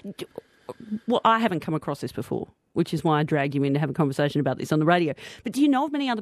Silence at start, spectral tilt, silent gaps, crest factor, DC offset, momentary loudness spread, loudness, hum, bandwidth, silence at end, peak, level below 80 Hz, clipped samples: 0.05 s; -6.5 dB/octave; none; 18 dB; under 0.1%; 15 LU; -24 LUFS; none; 14.5 kHz; 0 s; -6 dBFS; -64 dBFS; under 0.1%